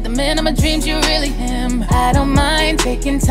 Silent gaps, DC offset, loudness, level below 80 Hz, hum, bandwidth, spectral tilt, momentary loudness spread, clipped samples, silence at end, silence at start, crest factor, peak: none; under 0.1%; -16 LUFS; -20 dBFS; none; 16 kHz; -4.5 dB/octave; 5 LU; under 0.1%; 0 s; 0 s; 14 dB; -2 dBFS